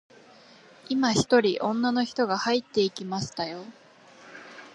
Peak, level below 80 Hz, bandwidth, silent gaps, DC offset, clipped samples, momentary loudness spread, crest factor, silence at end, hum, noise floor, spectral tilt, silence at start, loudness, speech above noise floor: -8 dBFS; -64 dBFS; 11 kHz; none; under 0.1%; under 0.1%; 22 LU; 20 dB; 0.05 s; none; -53 dBFS; -4.5 dB/octave; 0.9 s; -26 LUFS; 27 dB